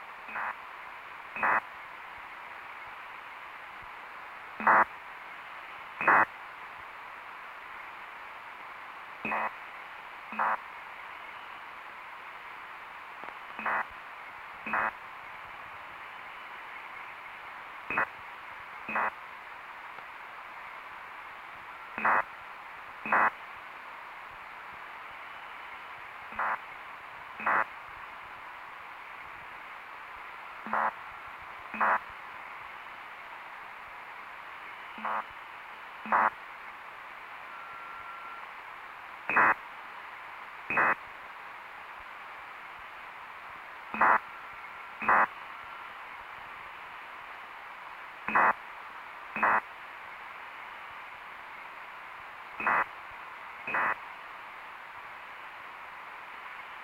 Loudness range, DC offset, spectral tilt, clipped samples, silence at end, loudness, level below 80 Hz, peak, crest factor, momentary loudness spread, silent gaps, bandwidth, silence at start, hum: 8 LU; under 0.1%; -4 dB/octave; under 0.1%; 0 s; -35 LUFS; -70 dBFS; -10 dBFS; 26 dB; 17 LU; none; 16 kHz; 0 s; none